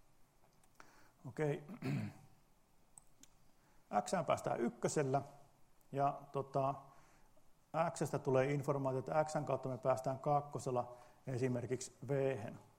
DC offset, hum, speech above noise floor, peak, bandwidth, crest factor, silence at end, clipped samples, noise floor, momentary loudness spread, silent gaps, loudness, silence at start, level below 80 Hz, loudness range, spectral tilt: under 0.1%; none; 30 dB; -22 dBFS; 16 kHz; 20 dB; 0.15 s; under 0.1%; -69 dBFS; 9 LU; none; -39 LUFS; 0.8 s; -72 dBFS; 8 LU; -6.5 dB/octave